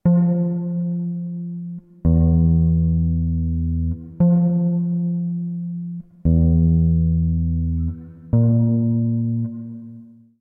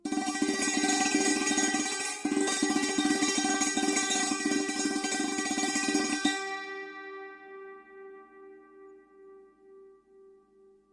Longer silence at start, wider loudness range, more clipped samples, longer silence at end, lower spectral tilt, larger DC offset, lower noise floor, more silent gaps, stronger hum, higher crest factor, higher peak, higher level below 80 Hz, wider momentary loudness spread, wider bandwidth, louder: about the same, 0.05 s vs 0.05 s; second, 2 LU vs 15 LU; neither; second, 0.35 s vs 1 s; first, -16 dB/octave vs -1 dB/octave; neither; second, -42 dBFS vs -61 dBFS; neither; neither; second, 12 dB vs 18 dB; first, -6 dBFS vs -14 dBFS; first, -28 dBFS vs -70 dBFS; second, 13 LU vs 19 LU; second, 1.5 kHz vs 11.5 kHz; first, -20 LUFS vs -28 LUFS